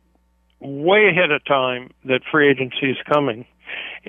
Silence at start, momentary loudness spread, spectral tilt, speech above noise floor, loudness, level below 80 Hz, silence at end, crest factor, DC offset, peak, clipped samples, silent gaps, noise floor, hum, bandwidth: 0.6 s; 18 LU; -7.5 dB/octave; 43 dB; -18 LUFS; -62 dBFS; 0.1 s; 16 dB; under 0.1%; -4 dBFS; under 0.1%; none; -61 dBFS; none; 3.8 kHz